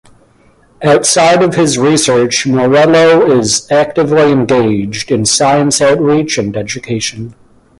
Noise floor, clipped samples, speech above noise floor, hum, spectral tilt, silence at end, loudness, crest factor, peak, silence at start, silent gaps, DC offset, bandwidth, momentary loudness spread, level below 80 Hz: -47 dBFS; under 0.1%; 38 dB; none; -4 dB/octave; 0.5 s; -10 LUFS; 10 dB; 0 dBFS; 0.8 s; none; under 0.1%; 11.5 kHz; 10 LU; -46 dBFS